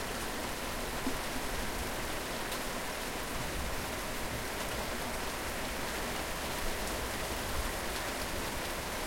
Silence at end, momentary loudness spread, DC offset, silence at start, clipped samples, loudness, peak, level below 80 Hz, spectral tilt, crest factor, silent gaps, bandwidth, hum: 0 s; 1 LU; under 0.1%; 0 s; under 0.1%; -36 LUFS; -22 dBFS; -44 dBFS; -3 dB/octave; 14 dB; none; 16.5 kHz; none